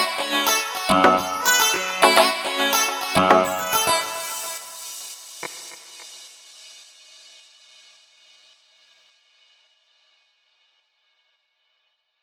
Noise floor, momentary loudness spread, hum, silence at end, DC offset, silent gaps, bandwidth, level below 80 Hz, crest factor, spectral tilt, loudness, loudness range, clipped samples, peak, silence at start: -71 dBFS; 23 LU; none; 5.45 s; under 0.1%; none; 19 kHz; -60 dBFS; 24 dB; -1.5 dB/octave; -19 LUFS; 22 LU; under 0.1%; 0 dBFS; 0 s